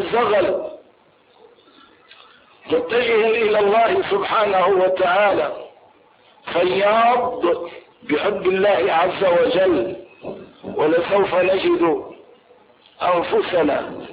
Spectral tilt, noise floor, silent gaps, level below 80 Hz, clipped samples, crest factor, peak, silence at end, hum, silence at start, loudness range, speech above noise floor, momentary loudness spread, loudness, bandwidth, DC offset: -9.5 dB/octave; -54 dBFS; none; -56 dBFS; under 0.1%; 12 dB; -6 dBFS; 0 s; none; 0 s; 4 LU; 37 dB; 15 LU; -18 LUFS; 5 kHz; under 0.1%